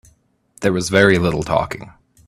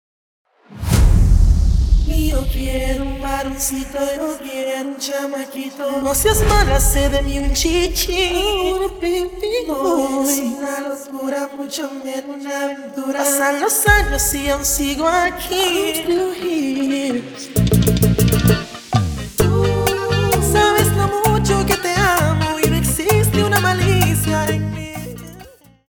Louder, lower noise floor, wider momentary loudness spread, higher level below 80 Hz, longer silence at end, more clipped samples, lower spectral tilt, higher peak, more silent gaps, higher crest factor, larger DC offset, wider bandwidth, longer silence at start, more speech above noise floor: about the same, -17 LUFS vs -17 LUFS; first, -57 dBFS vs -42 dBFS; about the same, 12 LU vs 11 LU; second, -44 dBFS vs -24 dBFS; about the same, 0.35 s vs 0.4 s; neither; about the same, -5 dB/octave vs -4.5 dB/octave; about the same, 0 dBFS vs 0 dBFS; neither; about the same, 18 dB vs 16 dB; neither; second, 14.5 kHz vs over 20 kHz; about the same, 0.6 s vs 0.7 s; first, 40 dB vs 24 dB